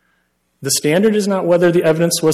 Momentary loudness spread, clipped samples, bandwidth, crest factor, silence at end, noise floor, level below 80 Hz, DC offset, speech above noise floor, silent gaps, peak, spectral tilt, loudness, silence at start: 4 LU; under 0.1%; 15 kHz; 12 dB; 0 s; -64 dBFS; -56 dBFS; under 0.1%; 50 dB; none; -2 dBFS; -4.5 dB/octave; -14 LUFS; 0.6 s